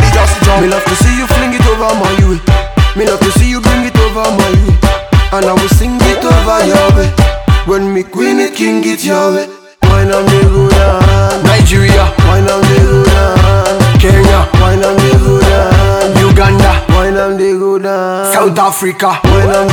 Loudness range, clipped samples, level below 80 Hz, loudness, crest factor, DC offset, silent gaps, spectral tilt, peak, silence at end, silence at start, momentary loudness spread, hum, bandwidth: 2 LU; 1%; -14 dBFS; -9 LUFS; 8 dB; under 0.1%; none; -5.5 dB/octave; 0 dBFS; 0 s; 0 s; 5 LU; none; 18.5 kHz